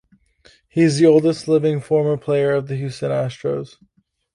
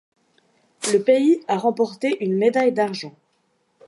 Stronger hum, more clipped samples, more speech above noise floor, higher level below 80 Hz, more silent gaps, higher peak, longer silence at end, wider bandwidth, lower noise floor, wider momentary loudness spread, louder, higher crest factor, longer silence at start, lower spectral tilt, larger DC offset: neither; neither; second, 36 dB vs 48 dB; first, -58 dBFS vs -78 dBFS; neither; first, -2 dBFS vs -6 dBFS; about the same, 0.7 s vs 0.75 s; about the same, 11 kHz vs 11.5 kHz; second, -54 dBFS vs -67 dBFS; first, 13 LU vs 10 LU; about the same, -19 LUFS vs -20 LUFS; about the same, 16 dB vs 16 dB; about the same, 0.75 s vs 0.8 s; first, -7 dB/octave vs -5 dB/octave; neither